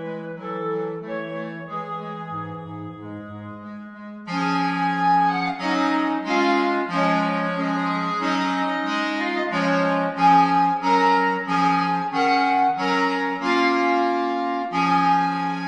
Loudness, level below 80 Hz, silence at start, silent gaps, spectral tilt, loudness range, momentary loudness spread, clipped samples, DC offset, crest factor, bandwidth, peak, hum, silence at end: -21 LUFS; -72 dBFS; 0 s; none; -6 dB/octave; 11 LU; 14 LU; under 0.1%; under 0.1%; 16 dB; 10 kHz; -6 dBFS; none; 0 s